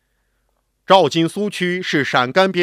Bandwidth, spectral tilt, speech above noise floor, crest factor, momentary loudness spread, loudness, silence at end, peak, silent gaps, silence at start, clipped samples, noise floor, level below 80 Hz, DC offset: 15 kHz; -5 dB/octave; 51 dB; 18 dB; 7 LU; -16 LUFS; 0 s; 0 dBFS; none; 0.9 s; under 0.1%; -67 dBFS; -64 dBFS; under 0.1%